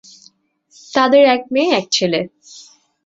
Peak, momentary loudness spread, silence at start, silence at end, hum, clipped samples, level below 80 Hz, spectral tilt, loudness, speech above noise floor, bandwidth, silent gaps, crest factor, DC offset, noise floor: -2 dBFS; 11 LU; 0.9 s; 0.45 s; none; under 0.1%; -64 dBFS; -3.5 dB/octave; -15 LUFS; 40 dB; 8 kHz; none; 16 dB; under 0.1%; -54 dBFS